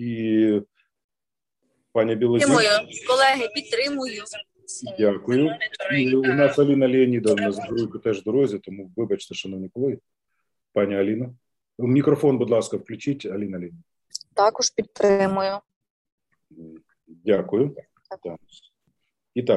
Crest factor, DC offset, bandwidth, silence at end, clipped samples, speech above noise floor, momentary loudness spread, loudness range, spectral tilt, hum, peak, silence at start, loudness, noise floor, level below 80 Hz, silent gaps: 18 dB; under 0.1%; 12 kHz; 0 s; under 0.1%; over 68 dB; 16 LU; 7 LU; -5 dB/octave; none; -6 dBFS; 0 s; -22 LUFS; under -90 dBFS; -66 dBFS; 1.04-1.09 s, 15.76-15.81 s, 15.90-16.05 s, 16.12-16.18 s